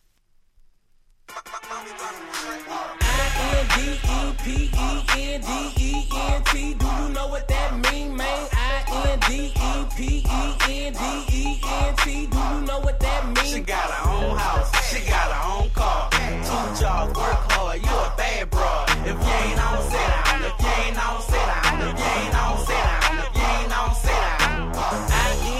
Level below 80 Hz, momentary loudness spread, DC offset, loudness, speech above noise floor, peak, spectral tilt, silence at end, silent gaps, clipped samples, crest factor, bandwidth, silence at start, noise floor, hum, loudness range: -24 dBFS; 6 LU; under 0.1%; -23 LUFS; 38 dB; -6 dBFS; -4 dB/octave; 0 s; none; under 0.1%; 16 dB; 14.5 kHz; 1.3 s; -59 dBFS; none; 2 LU